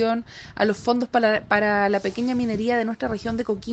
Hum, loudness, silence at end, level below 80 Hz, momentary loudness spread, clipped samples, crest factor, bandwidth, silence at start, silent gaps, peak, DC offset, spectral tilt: none; -23 LUFS; 0 s; -52 dBFS; 7 LU; under 0.1%; 18 dB; 8.4 kHz; 0 s; none; -4 dBFS; under 0.1%; -6 dB/octave